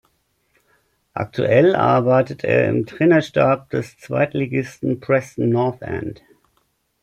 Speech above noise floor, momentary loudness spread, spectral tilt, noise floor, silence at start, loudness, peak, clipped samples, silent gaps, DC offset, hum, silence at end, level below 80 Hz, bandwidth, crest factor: 48 dB; 13 LU; -8 dB/octave; -66 dBFS; 1.15 s; -19 LUFS; -2 dBFS; under 0.1%; none; under 0.1%; none; 0.9 s; -56 dBFS; 12 kHz; 16 dB